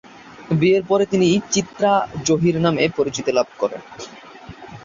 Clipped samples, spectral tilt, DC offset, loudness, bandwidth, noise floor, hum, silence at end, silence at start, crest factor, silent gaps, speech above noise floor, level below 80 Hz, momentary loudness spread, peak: under 0.1%; -5 dB/octave; under 0.1%; -19 LUFS; 7.8 kHz; -39 dBFS; none; 0.05 s; 0.25 s; 16 dB; none; 21 dB; -52 dBFS; 20 LU; -2 dBFS